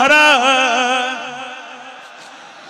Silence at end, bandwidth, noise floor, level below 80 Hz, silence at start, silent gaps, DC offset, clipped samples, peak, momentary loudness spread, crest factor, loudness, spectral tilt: 0 s; 16 kHz; -37 dBFS; -62 dBFS; 0 s; none; under 0.1%; under 0.1%; -2 dBFS; 25 LU; 14 dB; -13 LUFS; -0.5 dB/octave